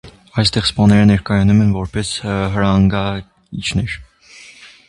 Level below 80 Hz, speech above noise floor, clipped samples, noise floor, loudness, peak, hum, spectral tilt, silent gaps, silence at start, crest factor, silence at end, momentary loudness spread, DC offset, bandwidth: -34 dBFS; 28 dB; under 0.1%; -42 dBFS; -15 LUFS; 0 dBFS; none; -6 dB/octave; none; 0.05 s; 16 dB; 0.2 s; 13 LU; under 0.1%; 11.5 kHz